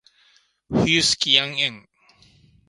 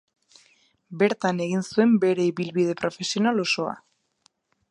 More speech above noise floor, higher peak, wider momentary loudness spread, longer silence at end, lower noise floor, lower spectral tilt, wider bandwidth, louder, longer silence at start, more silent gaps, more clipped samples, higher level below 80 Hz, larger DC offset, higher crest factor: second, 39 dB vs 43 dB; first, 0 dBFS vs -6 dBFS; about the same, 8 LU vs 8 LU; about the same, 0.9 s vs 0.9 s; second, -60 dBFS vs -66 dBFS; second, -2.5 dB/octave vs -5.5 dB/octave; about the same, 11.5 kHz vs 11 kHz; first, -19 LUFS vs -24 LUFS; second, 0.7 s vs 0.9 s; neither; neither; first, -52 dBFS vs -72 dBFS; neither; first, 24 dB vs 18 dB